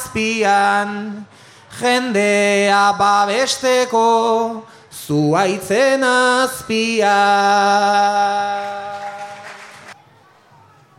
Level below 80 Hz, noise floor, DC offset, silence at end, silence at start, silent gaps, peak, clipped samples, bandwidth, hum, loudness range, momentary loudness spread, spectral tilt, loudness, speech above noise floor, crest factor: -58 dBFS; -49 dBFS; under 0.1%; 1.05 s; 0 s; none; -2 dBFS; under 0.1%; 16 kHz; none; 2 LU; 18 LU; -3.5 dB/octave; -15 LUFS; 34 dB; 14 dB